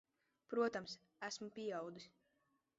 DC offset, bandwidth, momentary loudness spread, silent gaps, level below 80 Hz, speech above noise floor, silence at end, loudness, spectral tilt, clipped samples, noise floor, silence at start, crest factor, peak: under 0.1%; 7.6 kHz; 14 LU; none; -86 dBFS; 39 dB; 0.7 s; -45 LUFS; -3 dB/octave; under 0.1%; -83 dBFS; 0.5 s; 20 dB; -28 dBFS